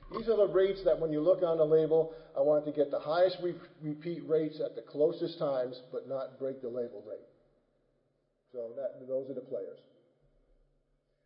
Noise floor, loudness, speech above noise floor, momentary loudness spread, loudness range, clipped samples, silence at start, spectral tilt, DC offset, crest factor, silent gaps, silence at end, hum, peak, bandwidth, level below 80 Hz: -76 dBFS; -32 LUFS; 45 dB; 15 LU; 14 LU; under 0.1%; 0 s; -10 dB/octave; under 0.1%; 16 dB; none; 1.5 s; none; -16 dBFS; 5.6 kHz; -66 dBFS